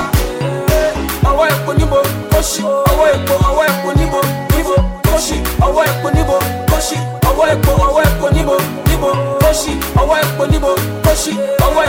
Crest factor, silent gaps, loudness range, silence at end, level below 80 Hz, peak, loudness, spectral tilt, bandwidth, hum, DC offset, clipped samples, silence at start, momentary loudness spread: 12 dB; none; 1 LU; 0 s; -20 dBFS; -2 dBFS; -14 LUFS; -5 dB/octave; 17.5 kHz; none; under 0.1%; under 0.1%; 0 s; 4 LU